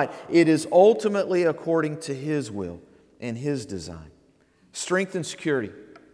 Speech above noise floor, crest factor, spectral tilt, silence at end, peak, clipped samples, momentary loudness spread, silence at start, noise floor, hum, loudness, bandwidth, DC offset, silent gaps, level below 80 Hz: 37 dB; 20 dB; -5.5 dB/octave; 0.2 s; -4 dBFS; under 0.1%; 18 LU; 0 s; -60 dBFS; none; -24 LUFS; 11 kHz; under 0.1%; none; -60 dBFS